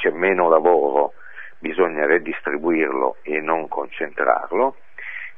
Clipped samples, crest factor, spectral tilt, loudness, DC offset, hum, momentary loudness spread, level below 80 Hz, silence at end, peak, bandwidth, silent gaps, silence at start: under 0.1%; 20 dB; -8 dB/octave; -20 LUFS; 1%; none; 15 LU; -66 dBFS; 0.1 s; 0 dBFS; 3.8 kHz; none; 0 s